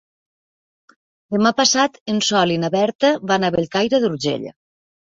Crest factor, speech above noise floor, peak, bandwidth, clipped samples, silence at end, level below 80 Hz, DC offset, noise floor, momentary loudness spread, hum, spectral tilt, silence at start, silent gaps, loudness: 18 dB; over 72 dB; -2 dBFS; 8 kHz; under 0.1%; 0.5 s; -58 dBFS; under 0.1%; under -90 dBFS; 8 LU; none; -3.5 dB/octave; 1.3 s; 2.01-2.06 s, 2.95-2.99 s; -18 LUFS